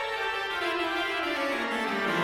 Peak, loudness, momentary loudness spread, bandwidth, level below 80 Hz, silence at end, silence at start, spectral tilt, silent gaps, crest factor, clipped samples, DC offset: -16 dBFS; -28 LUFS; 1 LU; 16 kHz; -62 dBFS; 0 s; 0 s; -3.5 dB/octave; none; 14 dB; under 0.1%; under 0.1%